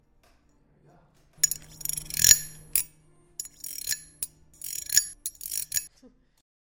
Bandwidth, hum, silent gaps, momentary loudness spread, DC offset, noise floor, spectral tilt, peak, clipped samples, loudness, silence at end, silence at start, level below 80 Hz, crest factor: 17 kHz; none; none; 21 LU; under 0.1%; -63 dBFS; 1.5 dB/octave; 0 dBFS; under 0.1%; -25 LUFS; 0.6 s; 1.4 s; -56 dBFS; 30 dB